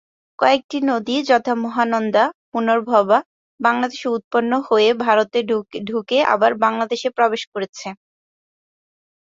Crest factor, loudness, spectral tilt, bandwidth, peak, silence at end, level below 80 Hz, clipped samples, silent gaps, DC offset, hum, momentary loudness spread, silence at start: 18 dB; -19 LUFS; -4.5 dB/octave; 7.8 kHz; -2 dBFS; 1.45 s; -68 dBFS; under 0.1%; 0.64-0.69 s, 2.34-2.52 s, 3.25-3.58 s, 4.24-4.31 s, 7.47-7.52 s, 7.69-7.73 s; under 0.1%; none; 9 LU; 0.4 s